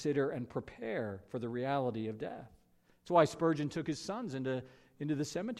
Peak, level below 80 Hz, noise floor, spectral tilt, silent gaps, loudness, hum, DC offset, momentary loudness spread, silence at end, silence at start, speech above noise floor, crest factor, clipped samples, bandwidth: -14 dBFS; -70 dBFS; -69 dBFS; -6 dB/octave; none; -36 LUFS; none; under 0.1%; 12 LU; 0 s; 0 s; 34 dB; 22 dB; under 0.1%; 13 kHz